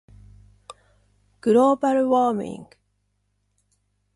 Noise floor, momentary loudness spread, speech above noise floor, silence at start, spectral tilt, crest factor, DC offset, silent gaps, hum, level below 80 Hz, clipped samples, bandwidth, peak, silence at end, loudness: -71 dBFS; 15 LU; 51 dB; 1.45 s; -6.5 dB/octave; 16 dB; under 0.1%; none; 50 Hz at -55 dBFS; -60 dBFS; under 0.1%; 11.5 kHz; -8 dBFS; 1.5 s; -20 LUFS